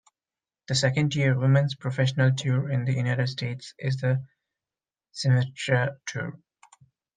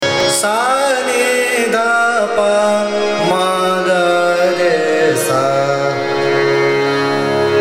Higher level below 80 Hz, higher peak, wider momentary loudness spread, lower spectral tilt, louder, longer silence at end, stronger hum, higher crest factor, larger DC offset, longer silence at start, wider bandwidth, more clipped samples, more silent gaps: second, -64 dBFS vs -58 dBFS; second, -8 dBFS vs -2 dBFS; first, 11 LU vs 2 LU; first, -6 dB/octave vs -3.5 dB/octave; second, -26 LUFS vs -14 LUFS; first, 0.8 s vs 0 s; neither; first, 18 dB vs 12 dB; neither; first, 0.7 s vs 0 s; second, 9.4 kHz vs 16 kHz; neither; neither